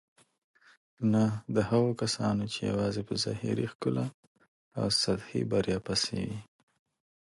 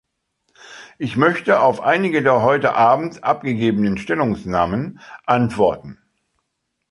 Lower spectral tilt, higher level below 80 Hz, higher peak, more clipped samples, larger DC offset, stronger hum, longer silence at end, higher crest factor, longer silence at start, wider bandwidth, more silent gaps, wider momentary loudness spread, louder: second, -5 dB/octave vs -7 dB/octave; second, -58 dBFS vs -50 dBFS; second, -14 dBFS vs 0 dBFS; neither; neither; neither; second, 0.85 s vs 1 s; about the same, 18 dB vs 18 dB; first, 1 s vs 0.65 s; about the same, 11.5 kHz vs 11.5 kHz; first, 3.75-3.80 s, 4.14-4.35 s, 4.48-4.71 s vs none; about the same, 8 LU vs 10 LU; second, -30 LUFS vs -18 LUFS